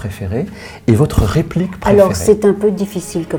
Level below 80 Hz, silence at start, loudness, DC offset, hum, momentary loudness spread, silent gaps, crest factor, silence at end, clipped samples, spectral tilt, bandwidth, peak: -30 dBFS; 0 s; -14 LUFS; under 0.1%; none; 11 LU; none; 14 dB; 0 s; 0.2%; -7 dB/octave; 20 kHz; 0 dBFS